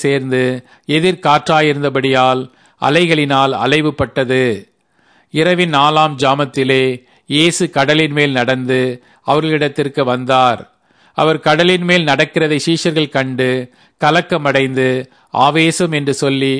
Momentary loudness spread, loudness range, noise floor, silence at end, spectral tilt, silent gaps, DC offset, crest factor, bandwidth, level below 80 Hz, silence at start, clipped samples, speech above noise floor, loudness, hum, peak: 7 LU; 2 LU; -54 dBFS; 0 s; -5 dB/octave; none; under 0.1%; 14 dB; 11 kHz; -52 dBFS; 0 s; under 0.1%; 40 dB; -14 LUFS; none; 0 dBFS